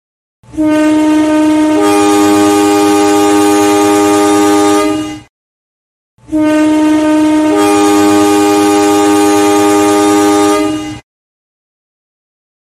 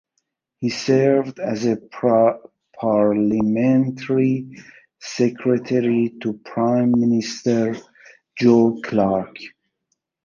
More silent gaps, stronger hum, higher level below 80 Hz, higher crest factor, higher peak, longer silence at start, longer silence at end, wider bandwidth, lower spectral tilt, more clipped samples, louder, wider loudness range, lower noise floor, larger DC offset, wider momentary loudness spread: first, 5.30-6.18 s vs none; neither; first, -44 dBFS vs -58 dBFS; second, 8 dB vs 16 dB; first, 0 dBFS vs -4 dBFS; about the same, 0.55 s vs 0.6 s; first, 1.7 s vs 0.8 s; first, 15 kHz vs 7.4 kHz; second, -4 dB/octave vs -7 dB/octave; neither; first, -9 LUFS vs -19 LUFS; about the same, 3 LU vs 2 LU; first, under -90 dBFS vs -74 dBFS; neither; second, 6 LU vs 13 LU